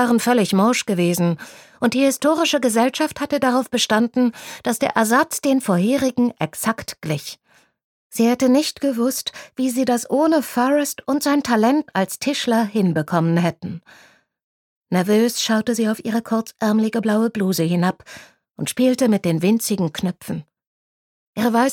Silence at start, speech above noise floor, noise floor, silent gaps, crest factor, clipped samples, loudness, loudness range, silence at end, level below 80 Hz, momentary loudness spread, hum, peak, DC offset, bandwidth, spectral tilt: 0 s; over 71 dB; under -90 dBFS; 7.84-8.10 s, 14.44-14.82 s, 20.67-21.33 s; 18 dB; under 0.1%; -19 LUFS; 3 LU; 0 s; -62 dBFS; 9 LU; none; -2 dBFS; under 0.1%; 18.5 kHz; -5 dB/octave